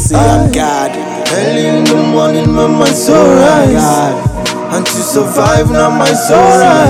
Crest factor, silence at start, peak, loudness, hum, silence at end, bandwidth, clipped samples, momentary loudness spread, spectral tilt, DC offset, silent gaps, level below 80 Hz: 8 dB; 0 s; 0 dBFS; -9 LUFS; none; 0 s; 16.5 kHz; 3%; 8 LU; -5 dB/octave; under 0.1%; none; -28 dBFS